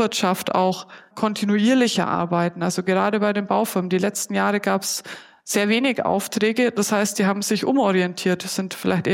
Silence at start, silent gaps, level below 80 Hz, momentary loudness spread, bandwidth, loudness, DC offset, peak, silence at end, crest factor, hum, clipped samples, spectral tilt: 0 s; none; -68 dBFS; 6 LU; 16.5 kHz; -21 LUFS; under 0.1%; -6 dBFS; 0 s; 16 dB; none; under 0.1%; -4.5 dB/octave